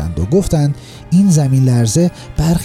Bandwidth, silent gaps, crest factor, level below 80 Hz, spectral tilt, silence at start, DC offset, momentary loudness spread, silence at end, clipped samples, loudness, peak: 15 kHz; none; 12 dB; -30 dBFS; -7 dB/octave; 0 s; under 0.1%; 7 LU; 0 s; under 0.1%; -14 LUFS; -2 dBFS